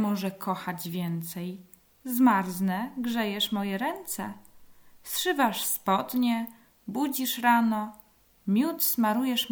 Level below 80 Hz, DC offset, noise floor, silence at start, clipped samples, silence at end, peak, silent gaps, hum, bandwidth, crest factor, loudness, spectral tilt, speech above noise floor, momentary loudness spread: -68 dBFS; under 0.1%; -52 dBFS; 0 s; under 0.1%; 0 s; -10 dBFS; none; none; over 20 kHz; 18 dB; -27 LUFS; -4 dB/octave; 24 dB; 15 LU